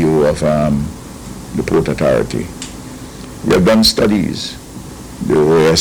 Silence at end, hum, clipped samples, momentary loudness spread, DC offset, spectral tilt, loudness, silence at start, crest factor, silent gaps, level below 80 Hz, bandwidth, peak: 0 s; none; under 0.1%; 20 LU; under 0.1%; -5 dB/octave; -14 LUFS; 0 s; 14 dB; none; -34 dBFS; 19 kHz; -2 dBFS